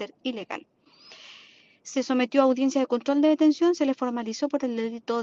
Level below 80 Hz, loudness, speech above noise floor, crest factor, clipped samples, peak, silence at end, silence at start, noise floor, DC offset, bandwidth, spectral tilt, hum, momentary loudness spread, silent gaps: -76 dBFS; -25 LUFS; 30 dB; 18 dB; under 0.1%; -6 dBFS; 0 s; 0 s; -54 dBFS; under 0.1%; 7.6 kHz; -4 dB/octave; none; 16 LU; none